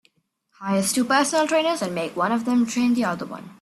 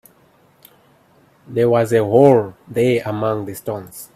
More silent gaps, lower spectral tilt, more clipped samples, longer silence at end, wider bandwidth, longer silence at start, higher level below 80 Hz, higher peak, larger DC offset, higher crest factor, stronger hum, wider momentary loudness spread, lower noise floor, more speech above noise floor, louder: neither; second, -4 dB/octave vs -7 dB/octave; neither; about the same, 0.1 s vs 0.1 s; second, 14 kHz vs 15.5 kHz; second, 0.6 s vs 1.5 s; second, -66 dBFS vs -58 dBFS; second, -6 dBFS vs 0 dBFS; neither; about the same, 18 dB vs 18 dB; neither; second, 8 LU vs 15 LU; first, -67 dBFS vs -54 dBFS; first, 46 dB vs 38 dB; second, -22 LUFS vs -17 LUFS